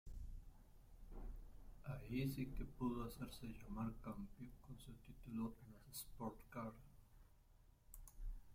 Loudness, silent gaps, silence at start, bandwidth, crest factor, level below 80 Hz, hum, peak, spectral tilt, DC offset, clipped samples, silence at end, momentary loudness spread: -51 LUFS; none; 0.05 s; 16.5 kHz; 18 dB; -58 dBFS; none; -32 dBFS; -6.5 dB/octave; under 0.1%; under 0.1%; 0 s; 17 LU